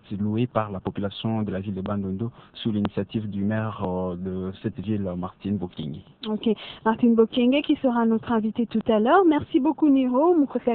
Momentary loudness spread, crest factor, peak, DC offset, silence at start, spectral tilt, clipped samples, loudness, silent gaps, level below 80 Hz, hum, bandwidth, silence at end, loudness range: 12 LU; 16 dB; -6 dBFS; under 0.1%; 0.1 s; -11 dB/octave; under 0.1%; -24 LUFS; none; -56 dBFS; none; 4.4 kHz; 0 s; 8 LU